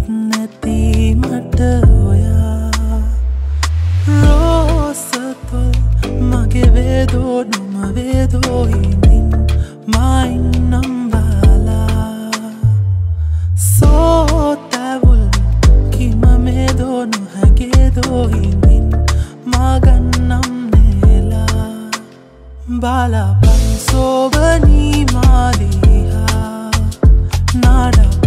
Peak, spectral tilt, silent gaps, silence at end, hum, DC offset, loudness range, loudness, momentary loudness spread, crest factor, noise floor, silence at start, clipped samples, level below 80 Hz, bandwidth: 0 dBFS; -6.5 dB/octave; none; 0 s; none; under 0.1%; 3 LU; -13 LUFS; 8 LU; 10 dB; -37 dBFS; 0 s; under 0.1%; -14 dBFS; 15 kHz